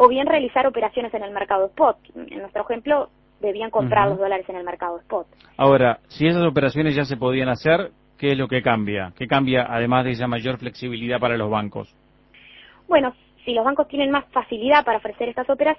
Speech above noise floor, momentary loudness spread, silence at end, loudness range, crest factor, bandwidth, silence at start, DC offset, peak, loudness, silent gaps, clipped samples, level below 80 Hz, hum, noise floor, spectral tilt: 31 dB; 12 LU; 0.05 s; 4 LU; 20 dB; 6 kHz; 0 s; under 0.1%; 0 dBFS; -21 LUFS; none; under 0.1%; -52 dBFS; none; -51 dBFS; -8 dB/octave